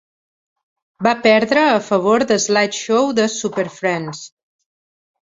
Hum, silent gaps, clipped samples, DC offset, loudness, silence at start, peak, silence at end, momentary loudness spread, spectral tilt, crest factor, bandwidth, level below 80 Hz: none; none; under 0.1%; under 0.1%; -16 LUFS; 1 s; 0 dBFS; 0.95 s; 9 LU; -3.5 dB/octave; 18 dB; 8 kHz; -62 dBFS